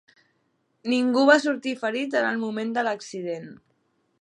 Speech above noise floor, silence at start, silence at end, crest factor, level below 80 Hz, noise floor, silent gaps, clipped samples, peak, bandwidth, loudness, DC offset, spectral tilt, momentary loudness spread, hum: 47 dB; 0.85 s; 0.65 s; 22 dB; -80 dBFS; -71 dBFS; none; under 0.1%; -4 dBFS; 10.5 kHz; -24 LUFS; under 0.1%; -4 dB/octave; 15 LU; none